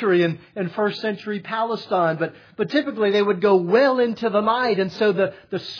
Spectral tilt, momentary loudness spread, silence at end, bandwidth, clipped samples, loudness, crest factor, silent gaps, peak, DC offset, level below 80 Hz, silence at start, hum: -7 dB/octave; 11 LU; 0 s; 5.4 kHz; under 0.1%; -21 LUFS; 16 dB; none; -6 dBFS; under 0.1%; -70 dBFS; 0 s; none